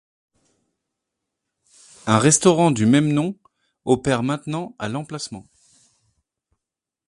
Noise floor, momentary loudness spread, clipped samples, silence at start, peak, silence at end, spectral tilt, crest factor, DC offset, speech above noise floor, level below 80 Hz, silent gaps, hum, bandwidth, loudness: -86 dBFS; 18 LU; under 0.1%; 2.05 s; 0 dBFS; 1.65 s; -5 dB/octave; 22 dB; under 0.1%; 67 dB; -56 dBFS; none; none; 11.5 kHz; -19 LUFS